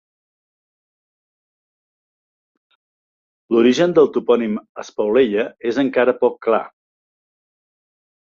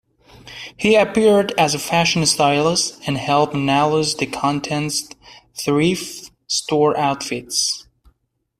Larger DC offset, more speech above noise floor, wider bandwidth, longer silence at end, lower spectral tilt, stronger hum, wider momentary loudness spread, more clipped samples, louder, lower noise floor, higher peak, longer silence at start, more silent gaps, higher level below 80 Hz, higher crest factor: neither; first, over 73 dB vs 47 dB; second, 7.4 kHz vs 15.5 kHz; first, 1.65 s vs 0.8 s; first, -6 dB/octave vs -3.5 dB/octave; neither; about the same, 10 LU vs 12 LU; neither; about the same, -17 LUFS vs -18 LUFS; first, under -90 dBFS vs -65 dBFS; about the same, -2 dBFS vs -2 dBFS; first, 3.5 s vs 0.45 s; first, 4.69-4.75 s vs none; second, -64 dBFS vs -54 dBFS; about the same, 18 dB vs 16 dB